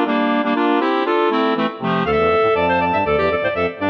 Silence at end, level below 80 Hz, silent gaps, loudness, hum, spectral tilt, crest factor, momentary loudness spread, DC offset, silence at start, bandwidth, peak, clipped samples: 0 s; -44 dBFS; none; -17 LUFS; none; -7.5 dB/octave; 12 dB; 4 LU; under 0.1%; 0 s; 6.6 kHz; -6 dBFS; under 0.1%